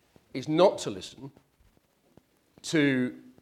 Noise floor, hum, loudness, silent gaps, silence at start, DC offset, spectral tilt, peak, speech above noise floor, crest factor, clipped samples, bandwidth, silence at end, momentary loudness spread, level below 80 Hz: -66 dBFS; none; -27 LUFS; none; 0.35 s; under 0.1%; -5 dB/octave; -8 dBFS; 39 dB; 22 dB; under 0.1%; 13.5 kHz; 0.25 s; 20 LU; -70 dBFS